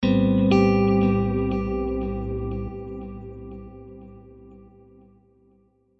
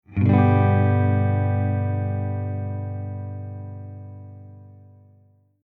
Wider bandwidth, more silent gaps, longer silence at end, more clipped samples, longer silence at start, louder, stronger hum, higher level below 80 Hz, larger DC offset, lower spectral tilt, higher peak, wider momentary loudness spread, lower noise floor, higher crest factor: first, 6.6 kHz vs 3.7 kHz; neither; first, 1.4 s vs 0.95 s; neither; about the same, 0 s vs 0.1 s; about the same, -22 LUFS vs -22 LUFS; second, none vs 50 Hz at -45 dBFS; first, -38 dBFS vs -54 dBFS; neither; second, -9 dB/octave vs -12 dB/octave; about the same, -6 dBFS vs -4 dBFS; about the same, 23 LU vs 22 LU; first, -61 dBFS vs -57 dBFS; about the same, 18 dB vs 18 dB